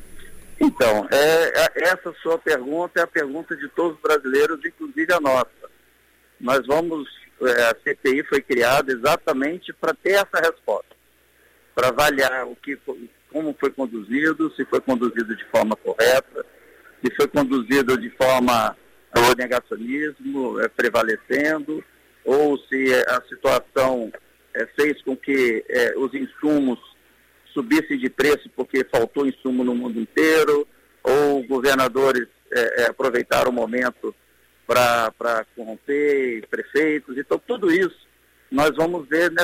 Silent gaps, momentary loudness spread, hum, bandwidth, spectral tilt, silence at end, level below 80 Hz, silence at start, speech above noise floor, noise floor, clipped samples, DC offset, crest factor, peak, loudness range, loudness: none; 11 LU; none; 16 kHz; -4 dB/octave; 0 s; -54 dBFS; 0 s; 38 dB; -58 dBFS; under 0.1%; under 0.1%; 16 dB; -6 dBFS; 3 LU; -21 LUFS